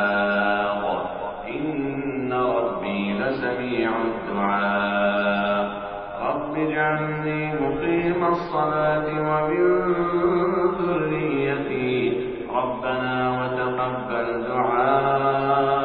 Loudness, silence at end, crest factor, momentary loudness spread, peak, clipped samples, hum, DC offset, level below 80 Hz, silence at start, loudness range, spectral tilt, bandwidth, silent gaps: -23 LUFS; 0 s; 16 dB; 6 LU; -8 dBFS; under 0.1%; none; under 0.1%; -50 dBFS; 0 s; 3 LU; -4.5 dB/octave; 5 kHz; none